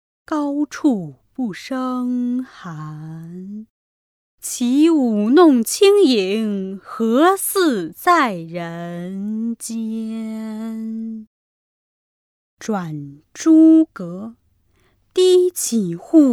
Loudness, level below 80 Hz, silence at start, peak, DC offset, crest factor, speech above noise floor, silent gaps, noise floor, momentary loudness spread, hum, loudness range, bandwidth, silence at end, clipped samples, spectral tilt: -18 LUFS; -66 dBFS; 0.3 s; 0 dBFS; under 0.1%; 18 dB; 43 dB; 3.70-4.38 s, 11.27-12.57 s; -60 dBFS; 20 LU; none; 12 LU; 16 kHz; 0 s; under 0.1%; -4.5 dB/octave